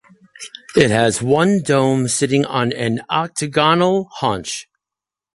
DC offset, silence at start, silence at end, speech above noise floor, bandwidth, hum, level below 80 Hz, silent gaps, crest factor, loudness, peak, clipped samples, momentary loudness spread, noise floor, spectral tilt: under 0.1%; 0.4 s; 0.75 s; 71 dB; 11.5 kHz; none; -52 dBFS; none; 16 dB; -17 LUFS; -2 dBFS; under 0.1%; 12 LU; -87 dBFS; -4.5 dB/octave